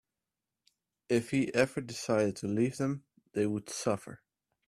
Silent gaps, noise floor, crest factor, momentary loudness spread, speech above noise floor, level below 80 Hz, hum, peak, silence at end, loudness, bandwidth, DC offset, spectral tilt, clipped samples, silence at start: none; -90 dBFS; 20 dB; 8 LU; 58 dB; -68 dBFS; none; -12 dBFS; 0.5 s; -32 LUFS; 14.5 kHz; under 0.1%; -5.5 dB/octave; under 0.1%; 1.1 s